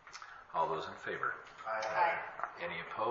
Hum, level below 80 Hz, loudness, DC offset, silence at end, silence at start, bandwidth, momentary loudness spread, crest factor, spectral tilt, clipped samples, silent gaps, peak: none; -74 dBFS; -37 LUFS; under 0.1%; 0 s; 0.05 s; 7.4 kHz; 11 LU; 18 dB; -1.5 dB/octave; under 0.1%; none; -20 dBFS